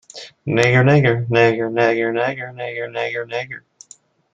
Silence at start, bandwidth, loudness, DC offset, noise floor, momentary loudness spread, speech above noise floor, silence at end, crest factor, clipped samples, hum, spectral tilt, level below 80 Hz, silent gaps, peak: 0.15 s; 9 kHz; -18 LUFS; under 0.1%; -49 dBFS; 15 LU; 32 dB; 0.75 s; 18 dB; under 0.1%; none; -6.5 dB/octave; -56 dBFS; none; 0 dBFS